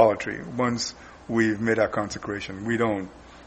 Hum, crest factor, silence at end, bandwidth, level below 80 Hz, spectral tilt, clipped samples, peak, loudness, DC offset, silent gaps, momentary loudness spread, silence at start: none; 20 dB; 0 s; 8.4 kHz; -54 dBFS; -5 dB/octave; under 0.1%; -6 dBFS; -26 LUFS; under 0.1%; none; 9 LU; 0 s